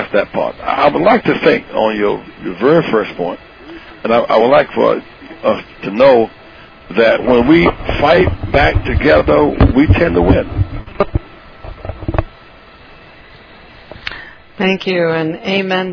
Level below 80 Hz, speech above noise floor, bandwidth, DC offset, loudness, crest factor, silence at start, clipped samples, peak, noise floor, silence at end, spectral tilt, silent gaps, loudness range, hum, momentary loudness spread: -26 dBFS; 27 dB; 5.4 kHz; under 0.1%; -13 LUFS; 14 dB; 0 s; under 0.1%; 0 dBFS; -39 dBFS; 0 s; -8 dB/octave; none; 12 LU; none; 16 LU